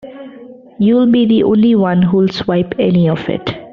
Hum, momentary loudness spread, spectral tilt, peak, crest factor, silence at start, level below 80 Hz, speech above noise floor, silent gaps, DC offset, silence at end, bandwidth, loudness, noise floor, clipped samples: none; 9 LU; -7 dB/octave; -2 dBFS; 12 dB; 0.05 s; -48 dBFS; 24 dB; none; under 0.1%; 0.05 s; 6.4 kHz; -13 LUFS; -36 dBFS; under 0.1%